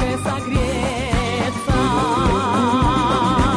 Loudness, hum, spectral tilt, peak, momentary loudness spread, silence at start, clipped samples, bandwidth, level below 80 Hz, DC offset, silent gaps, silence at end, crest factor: -19 LUFS; none; -5.5 dB/octave; -6 dBFS; 5 LU; 0 s; under 0.1%; 11 kHz; -28 dBFS; under 0.1%; none; 0 s; 12 dB